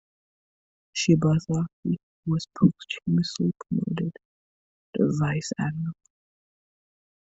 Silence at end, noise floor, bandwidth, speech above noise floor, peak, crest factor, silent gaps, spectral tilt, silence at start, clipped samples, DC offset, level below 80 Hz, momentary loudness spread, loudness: 1.3 s; under -90 dBFS; 7.8 kHz; over 65 dB; -6 dBFS; 22 dB; 1.73-1.83 s, 2.03-2.23 s, 4.25-4.93 s; -6.5 dB/octave; 0.95 s; under 0.1%; under 0.1%; -60 dBFS; 11 LU; -26 LUFS